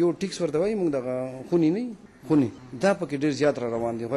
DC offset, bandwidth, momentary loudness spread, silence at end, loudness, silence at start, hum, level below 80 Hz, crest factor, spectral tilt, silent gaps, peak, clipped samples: under 0.1%; 11.5 kHz; 7 LU; 0 s; -26 LUFS; 0 s; none; -60 dBFS; 12 dB; -6.5 dB/octave; none; -12 dBFS; under 0.1%